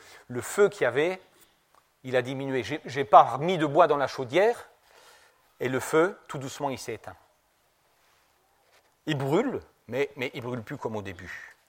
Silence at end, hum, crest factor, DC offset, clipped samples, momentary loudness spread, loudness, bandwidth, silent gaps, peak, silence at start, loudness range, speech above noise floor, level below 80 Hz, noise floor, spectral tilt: 0.2 s; none; 26 dB; under 0.1%; under 0.1%; 17 LU; -26 LUFS; 16.5 kHz; none; -2 dBFS; 0.1 s; 10 LU; 42 dB; -68 dBFS; -68 dBFS; -5.5 dB/octave